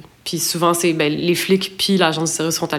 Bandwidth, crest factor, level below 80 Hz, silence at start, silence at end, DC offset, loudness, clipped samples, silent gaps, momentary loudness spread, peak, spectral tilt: 18 kHz; 18 dB; -60 dBFS; 0.25 s; 0 s; under 0.1%; -18 LUFS; under 0.1%; none; 4 LU; 0 dBFS; -3.5 dB/octave